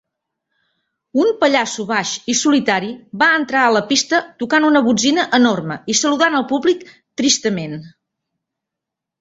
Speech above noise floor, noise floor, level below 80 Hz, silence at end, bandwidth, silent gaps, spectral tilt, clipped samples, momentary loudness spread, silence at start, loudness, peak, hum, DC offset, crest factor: 67 dB; -83 dBFS; -60 dBFS; 1.3 s; 8 kHz; none; -3 dB/octave; under 0.1%; 9 LU; 1.15 s; -16 LUFS; 0 dBFS; none; under 0.1%; 18 dB